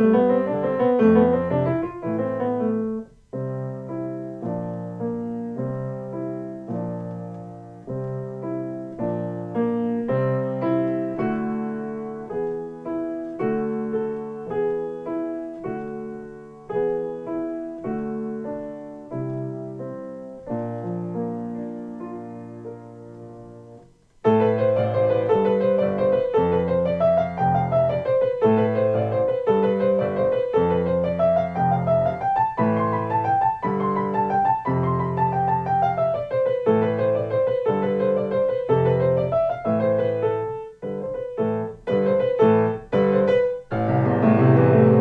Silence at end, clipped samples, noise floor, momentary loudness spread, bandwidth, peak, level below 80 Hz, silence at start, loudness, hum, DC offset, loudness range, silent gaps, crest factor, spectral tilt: 0 s; under 0.1%; -50 dBFS; 14 LU; 5 kHz; -4 dBFS; -54 dBFS; 0 s; -23 LUFS; none; under 0.1%; 10 LU; none; 18 dB; -10 dB/octave